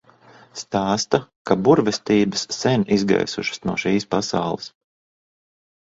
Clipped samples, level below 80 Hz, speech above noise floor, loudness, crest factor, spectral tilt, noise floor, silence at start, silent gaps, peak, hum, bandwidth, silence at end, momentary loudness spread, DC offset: under 0.1%; -54 dBFS; 30 dB; -21 LUFS; 22 dB; -5 dB/octave; -50 dBFS; 0.55 s; 1.36-1.45 s; 0 dBFS; none; 7.8 kHz; 1.15 s; 10 LU; under 0.1%